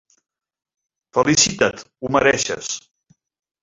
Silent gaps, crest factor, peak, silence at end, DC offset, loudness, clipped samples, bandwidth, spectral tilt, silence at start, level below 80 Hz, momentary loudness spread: none; 20 dB; -2 dBFS; 0.85 s; under 0.1%; -18 LUFS; under 0.1%; 8 kHz; -2.5 dB/octave; 1.15 s; -52 dBFS; 14 LU